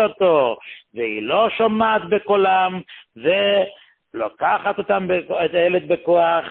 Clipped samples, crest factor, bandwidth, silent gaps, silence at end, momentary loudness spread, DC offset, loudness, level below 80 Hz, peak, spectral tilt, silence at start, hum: under 0.1%; 14 dB; 4.2 kHz; none; 0 s; 11 LU; under 0.1%; -19 LUFS; -60 dBFS; -4 dBFS; -10 dB/octave; 0 s; none